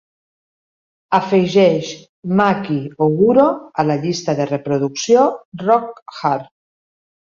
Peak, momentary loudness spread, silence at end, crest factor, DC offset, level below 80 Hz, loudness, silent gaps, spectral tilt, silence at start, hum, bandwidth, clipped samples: -2 dBFS; 10 LU; 0.85 s; 16 dB; under 0.1%; -60 dBFS; -17 LUFS; 2.09-2.23 s, 5.45-5.52 s, 6.02-6.06 s; -6 dB/octave; 1.1 s; none; 7.4 kHz; under 0.1%